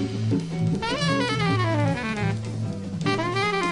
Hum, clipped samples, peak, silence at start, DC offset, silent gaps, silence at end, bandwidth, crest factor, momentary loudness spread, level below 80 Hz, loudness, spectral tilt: none; under 0.1%; -10 dBFS; 0 s; under 0.1%; none; 0 s; 11 kHz; 14 dB; 6 LU; -48 dBFS; -25 LUFS; -6 dB/octave